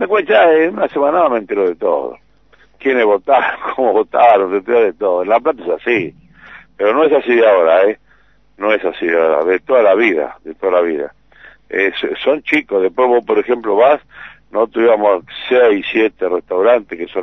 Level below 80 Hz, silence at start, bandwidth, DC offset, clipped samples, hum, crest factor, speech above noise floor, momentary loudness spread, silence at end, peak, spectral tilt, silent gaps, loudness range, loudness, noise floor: -56 dBFS; 0 s; 6 kHz; 0.2%; under 0.1%; none; 14 dB; 40 dB; 9 LU; 0 s; 0 dBFS; -6.5 dB/octave; none; 2 LU; -14 LUFS; -53 dBFS